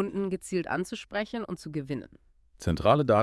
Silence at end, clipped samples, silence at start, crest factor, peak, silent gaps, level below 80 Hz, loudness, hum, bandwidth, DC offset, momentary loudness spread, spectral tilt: 0 s; under 0.1%; 0 s; 22 dB; -8 dBFS; none; -52 dBFS; -30 LUFS; none; 12 kHz; under 0.1%; 12 LU; -6.5 dB/octave